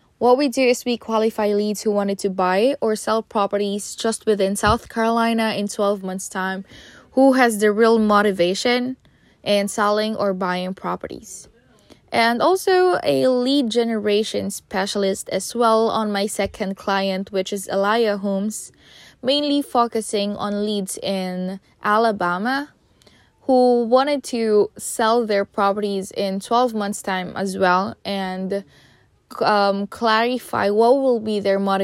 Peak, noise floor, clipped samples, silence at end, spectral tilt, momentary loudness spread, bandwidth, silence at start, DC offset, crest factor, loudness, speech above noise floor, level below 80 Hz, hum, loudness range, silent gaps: -2 dBFS; -55 dBFS; under 0.1%; 0 s; -4.5 dB/octave; 10 LU; 16 kHz; 0.2 s; under 0.1%; 18 dB; -20 LUFS; 35 dB; -52 dBFS; none; 4 LU; none